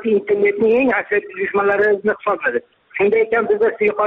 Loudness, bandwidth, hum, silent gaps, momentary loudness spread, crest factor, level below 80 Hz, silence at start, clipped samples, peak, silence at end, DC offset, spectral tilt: -17 LUFS; 4 kHz; none; none; 6 LU; 10 dB; -58 dBFS; 0 s; under 0.1%; -6 dBFS; 0 s; under 0.1%; -4 dB/octave